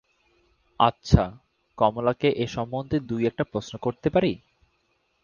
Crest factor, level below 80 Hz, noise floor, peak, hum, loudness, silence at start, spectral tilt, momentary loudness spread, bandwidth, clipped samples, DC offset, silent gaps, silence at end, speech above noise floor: 24 dB; -40 dBFS; -70 dBFS; 0 dBFS; none; -25 LUFS; 0.8 s; -7 dB/octave; 8 LU; 7.2 kHz; under 0.1%; under 0.1%; none; 0.85 s; 46 dB